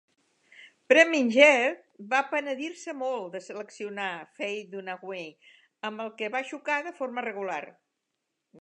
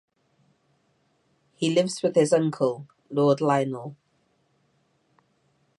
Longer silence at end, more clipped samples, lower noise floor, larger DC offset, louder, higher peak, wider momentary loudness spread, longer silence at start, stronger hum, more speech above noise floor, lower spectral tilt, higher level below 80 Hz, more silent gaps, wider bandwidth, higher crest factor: second, 0.9 s vs 1.85 s; neither; first, -82 dBFS vs -69 dBFS; neither; about the same, -26 LUFS vs -24 LUFS; first, -4 dBFS vs -8 dBFS; first, 19 LU vs 13 LU; second, 0.6 s vs 1.6 s; neither; first, 55 dB vs 46 dB; second, -3 dB/octave vs -6 dB/octave; second, -88 dBFS vs -76 dBFS; neither; second, 9.2 kHz vs 11.5 kHz; first, 26 dB vs 20 dB